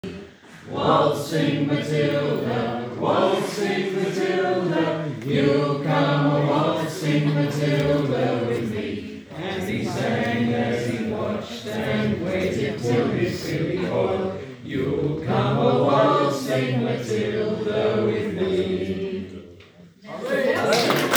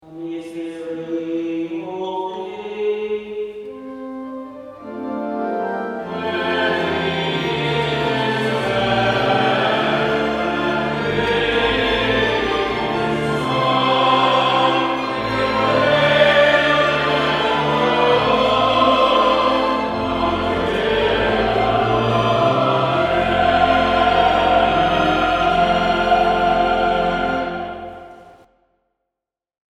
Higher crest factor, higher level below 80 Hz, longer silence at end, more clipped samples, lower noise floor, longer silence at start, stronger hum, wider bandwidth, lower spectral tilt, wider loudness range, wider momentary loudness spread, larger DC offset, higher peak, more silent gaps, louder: about the same, 22 dB vs 18 dB; second, -56 dBFS vs -40 dBFS; second, 0 s vs 1.45 s; neither; second, -48 dBFS vs -85 dBFS; about the same, 0.05 s vs 0.05 s; neither; first, over 20 kHz vs 13 kHz; about the same, -6 dB/octave vs -5.5 dB/octave; second, 3 LU vs 10 LU; second, 9 LU vs 14 LU; neither; about the same, 0 dBFS vs -2 dBFS; neither; second, -23 LUFS vs -17 LUFS